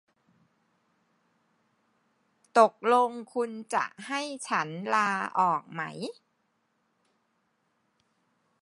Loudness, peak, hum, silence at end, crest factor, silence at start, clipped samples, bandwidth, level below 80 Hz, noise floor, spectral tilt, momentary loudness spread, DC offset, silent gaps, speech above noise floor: -28 LUFS; -6 dBFS; none; 2.5 s; 24 dB; 2.55 s; under 0.1%; 11.5 kHz; -88 dBFS; -75 dBFS; -4 dB/octave; 13 LU; under 0.1%; none; 47 dB